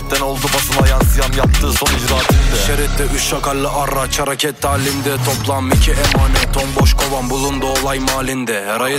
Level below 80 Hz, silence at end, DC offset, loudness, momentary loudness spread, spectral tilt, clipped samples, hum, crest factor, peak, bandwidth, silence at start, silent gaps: -18 dBFS; 0 s; under 0.1%; -15 LUFS; 4 LU; -4 dB/octave; under 0.1%; none; 14 dB; 0 dBFS; 16.5 kHz; 0 s; none